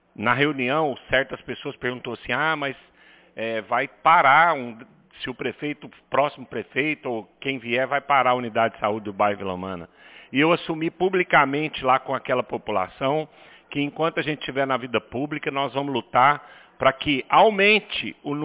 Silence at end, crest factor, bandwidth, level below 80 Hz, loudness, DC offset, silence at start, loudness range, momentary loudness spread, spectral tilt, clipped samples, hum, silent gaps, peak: 0 s; 18 dB; 4 kHz; -58 dBFS; -22 LUFS; under 0.1%; 0.2 s; 5 LU; 14 LU; -8.5 dB/octave; under 0.1%; none; none; -4 dBFS